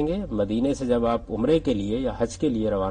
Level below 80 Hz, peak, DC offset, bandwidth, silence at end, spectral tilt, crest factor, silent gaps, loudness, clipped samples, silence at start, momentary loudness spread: -40 dBFS; -10 dBFS; under 0.1%; 10 kHz; 0 s; -7 dB/octave; 14 dB; none; -25 LUFS; under 0.1%; 0 s; 4 LU